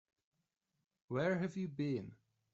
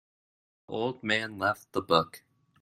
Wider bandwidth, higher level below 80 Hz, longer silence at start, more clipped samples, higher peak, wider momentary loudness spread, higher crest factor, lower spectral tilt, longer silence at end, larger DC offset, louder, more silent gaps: second, 7.8 kHz vs 16 kHz; second, -78 dBFS vs -68 dBFS; first, 1.1 s vs 0.7 s; neither; second, -24 dBFS vs -6 dBFS; second, 7 LU vs 10 LU; second, 18 dB vs 26 dB; first, -7 dB/octave vs -4.5 dB/octave; about the same, 0.4 s vs 0.45 s; neither; second, -39 LUFS vs -30 LUFS; neither